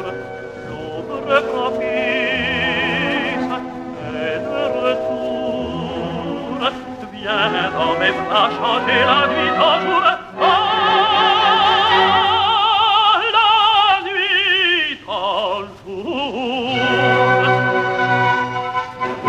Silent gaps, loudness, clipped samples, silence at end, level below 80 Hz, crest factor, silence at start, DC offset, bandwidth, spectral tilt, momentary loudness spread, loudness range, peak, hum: none; -16 LUFS; under 0.1%; 0 s; -50 dBFS; 16 dB; 0 s; under 0.1%; 10.5 kHz; -5 dB/octave; 13 LU; 8 LU; 0 dBFS; none